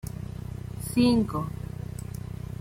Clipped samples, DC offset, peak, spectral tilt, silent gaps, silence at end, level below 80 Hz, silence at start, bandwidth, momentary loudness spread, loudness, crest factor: under 0.1%; under 0.1%; -10 dBFS; -6.5 dB/octave; none; 0 s; -44 dBFS; 0.05 s; 16.5 kHz; 15 LU; -29 LUFS; 18 dB